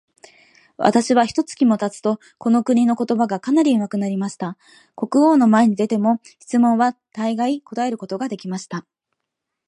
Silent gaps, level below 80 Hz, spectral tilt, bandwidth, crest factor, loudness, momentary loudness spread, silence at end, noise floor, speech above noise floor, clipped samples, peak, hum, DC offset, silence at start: none; -66 dBFS; -6 dB/octave; 11 kHz; 18 dB; -19 LUFS; 11 LU; 0.9 s; -80 dBFS; 62 dB; under 0.1%; 0 dBFS; none; under 0.1%; 0.8 s